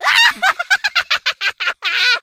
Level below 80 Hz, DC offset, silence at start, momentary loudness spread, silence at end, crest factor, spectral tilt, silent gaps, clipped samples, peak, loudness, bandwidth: -62 dBFS; under 0.1%; 0 s; 7 LU; 0.05 s; 16 dB; 2 dB/octave; none; under 0.1%; 0 dBFS; -15 LUFS; 16.5 kHz